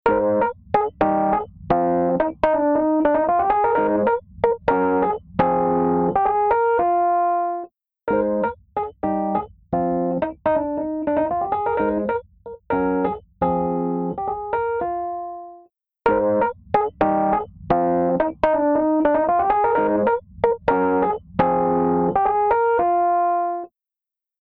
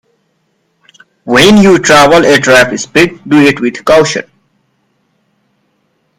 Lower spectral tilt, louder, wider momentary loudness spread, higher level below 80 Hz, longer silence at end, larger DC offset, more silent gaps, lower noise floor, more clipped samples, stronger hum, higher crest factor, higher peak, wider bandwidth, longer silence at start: first, -10 dB/octave vs -4 dB/octave; second, -21 LUFS vs -7 LUFS; about the same, 7 LU vs 9 LU; second, -48 dBFS vs -40 dBFS; second, 0.75 s vs 1.95 s; neither; neither; first, -89 dBFS vs -59 dBFS; second, under 0.1% vs 2%; neither; first, 16 dB vs 10 dB; second, -4 dBFS vs 0 dBFS; second, 5.2 kHz vs 18 kHz; second, 0.05 s vs 1.25 s